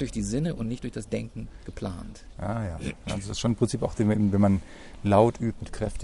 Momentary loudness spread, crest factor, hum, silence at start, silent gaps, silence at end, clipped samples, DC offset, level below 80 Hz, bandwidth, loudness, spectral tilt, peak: 16 LU; 20 dB; none; 0 s; none; 0 s; under 0.1%; under 0.1%; -42 dBFS; 11.5 kHz; -27 LUFS; -6.5 dB/octave; -6 dBFS